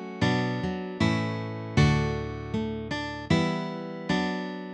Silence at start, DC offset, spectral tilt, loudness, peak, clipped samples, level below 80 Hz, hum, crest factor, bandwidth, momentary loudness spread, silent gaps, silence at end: 0 s; under 0.1%; -6.5 dB/octave; -28 LUFS; -10 dBFS; under 0.1%; -44 dBFS; none; 18 dB; 9.6 kHz; 9 LU; none; 0 s